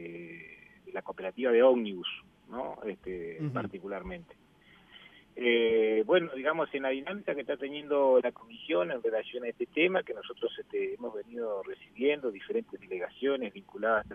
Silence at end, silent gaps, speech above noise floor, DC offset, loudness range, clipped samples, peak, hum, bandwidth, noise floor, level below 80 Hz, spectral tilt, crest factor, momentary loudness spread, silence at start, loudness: 0 s; none; 29 dB; under 0.1%; 6 LU; under 0.1%; -12 dBFS; none; 3.7 kHz; -60 dBFS; -66 dBFS; -7.5 dB/octave; 20 dB; 17 LU; 0 s; -31 LUFS